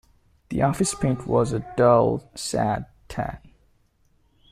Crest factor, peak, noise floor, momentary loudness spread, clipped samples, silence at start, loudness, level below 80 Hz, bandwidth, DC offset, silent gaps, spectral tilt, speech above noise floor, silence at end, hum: 18 dB; -6 dBFS; -63 dBFS; 14 LU; under 0.1%; 0.5 s; -23 LUFS; -46 dBFS; 15 kHz; under 0.1%; none; -6 dB/octave; 41 dB; 1.15 s; none